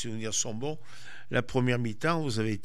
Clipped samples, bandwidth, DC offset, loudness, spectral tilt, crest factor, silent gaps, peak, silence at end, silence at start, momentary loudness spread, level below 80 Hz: under 0.1%; 13.5 kHz; 2%; -30 LUFS; -4.5 dB/octave; 18 dB; none; -14 dBFS; 0.05 s; 0 s; 14 LU; -60 dBFS